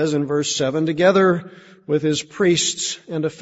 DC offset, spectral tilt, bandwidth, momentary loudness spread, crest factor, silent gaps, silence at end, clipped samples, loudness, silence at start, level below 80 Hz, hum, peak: under 0.1%; -4 dB/octave; 8 kHz; 9 LU; 16 dB; none; 0.05 s; under 0.1%; -19 LUFS; 0 s; -60 dBFS; none; -4 dBFS